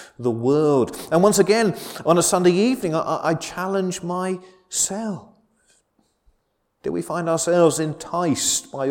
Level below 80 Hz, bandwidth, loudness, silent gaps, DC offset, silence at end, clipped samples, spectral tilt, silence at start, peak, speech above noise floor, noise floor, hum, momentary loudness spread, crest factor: -58 dBFS; 18 kHz; -20 LUFS; none; under 0.1%; 0 s; under 0.1%; -4.5 dB/octave; 0 s; -2 dBFS; 49 dB; -69 dBFS; none; 11 LU; 20 dB